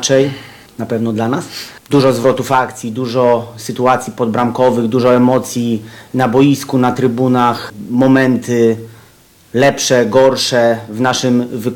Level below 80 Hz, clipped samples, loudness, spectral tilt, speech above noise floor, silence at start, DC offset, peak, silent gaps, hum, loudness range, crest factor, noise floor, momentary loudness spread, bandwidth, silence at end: -52 dBFS; under 0.1%; -13 LUFS; -5 dB/octave; 33 dB; 0 s; under 0.1%; 0 dBFS; none; none; 2 LU; 14 dB; -45 dBFS; 11 LU; 18 kHz; 0 s